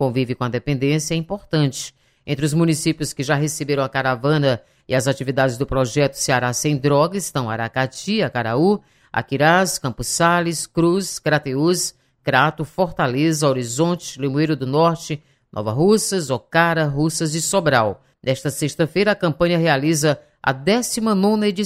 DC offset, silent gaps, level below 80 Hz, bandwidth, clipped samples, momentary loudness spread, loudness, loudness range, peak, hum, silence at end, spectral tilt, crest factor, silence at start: under 0.1%; none; -48 dBFS; 16 kHz; under 0.1%; 7 LU; -19 LUFS; 2 LU; -2 dBFS; none; 0 s; -5 dB/octave; 18 dB; 0 s